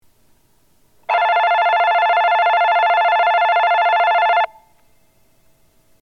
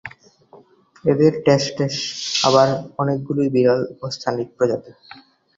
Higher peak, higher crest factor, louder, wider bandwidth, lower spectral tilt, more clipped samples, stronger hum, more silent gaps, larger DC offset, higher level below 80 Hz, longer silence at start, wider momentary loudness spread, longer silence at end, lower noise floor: second, -6 dBFS vs -2 dBFS; second, 12 dB vs 18 dB; first, -15 LUFS vs -19 LUFS; second, 6.4 kHz vs 7.8 kHz; second, -0.5 dB/octave vs -5 dB/octave; neither; neither; neither; first, 0.1% vs under 0.1%; second, -66 dBFS vs -58 dBFS; first, 1.1 s vs 0.05 s; second, 4 LU vs 10 LU; first, 1.55 s vs 0.65 s; first, -59 dBFS vs -50 dBFS